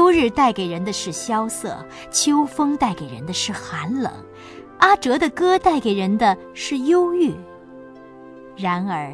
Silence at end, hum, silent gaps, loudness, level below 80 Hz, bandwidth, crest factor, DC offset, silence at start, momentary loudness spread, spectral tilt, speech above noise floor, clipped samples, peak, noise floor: 0 s; none; none; -20 LUFS; -50 dBFS; 11 kHz; 18 dB; under 0.1%; 0 s; 14 LU; -4 dB/octave; 21 dB; under 0.1%; -2 dBFS; -41 dBFS